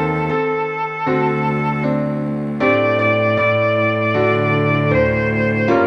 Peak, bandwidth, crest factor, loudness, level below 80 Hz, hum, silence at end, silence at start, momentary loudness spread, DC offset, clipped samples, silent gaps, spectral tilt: -4 dBFS; 6.6 kHz; 14 dB; -17 LUFS; -44 dBFS; none; 0 s; 0 s; 5 LU; under 0.1%; under 0.1%; none; -8.5 dB/octave